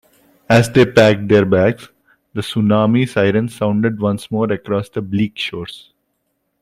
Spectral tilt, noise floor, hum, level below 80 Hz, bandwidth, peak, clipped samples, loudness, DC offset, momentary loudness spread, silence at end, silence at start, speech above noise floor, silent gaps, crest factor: -6.5 dB/octave; -69 dBFS; none; -50 dBFS; 14.5 kHz; 0 dBFS; under 0.1%; -16 LUFS; under 0.1%; 12 LU; 0.85 s; 0.5 s; 54 dB; none; 16 dB